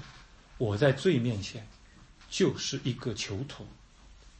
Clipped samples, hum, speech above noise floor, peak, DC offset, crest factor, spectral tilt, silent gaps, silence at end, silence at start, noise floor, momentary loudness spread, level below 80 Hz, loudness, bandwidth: under 0.1%; none; 25 dB; -12 dBFS; under 0.1%; 20 dB; -5.5 dB/octave; none; 0.1 s; 0 s; -55 dBFS; 20 LU; -56 dBFS; -30 LUFS; 8.8 kHz